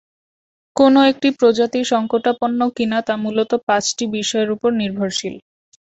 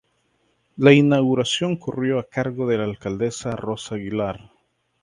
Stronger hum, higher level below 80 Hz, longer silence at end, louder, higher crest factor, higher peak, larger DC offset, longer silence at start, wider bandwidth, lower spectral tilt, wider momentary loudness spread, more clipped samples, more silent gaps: neither; about the same, -60 dBFS vs -56 dBFS; about the same, 0.55 s vs 0.65 s; first, -17 LUFS vs -21 LUFS; about the same, 16 dB vs 20 dB; about the same, -2 dBFS vs 0 dBFS; neither; about the same, 0.75 s vs 0.75 s; second, 8.2 kHz vs 11 kHz; second, -4 dB/octave vs -6 dB/octave; second, 8 LU vs 13 LU; neither; first, 3.63-3.67 s vs none